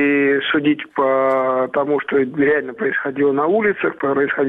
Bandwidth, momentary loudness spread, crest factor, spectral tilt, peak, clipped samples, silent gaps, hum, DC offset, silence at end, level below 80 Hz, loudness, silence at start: 3.9 kHz; 3 LU; 10 dB; -8 dB/octave; -6 dBFS; under 0.1%; none; none; under 0.1%; 0 s; -60 dBFS; -18 LUFS; 0 s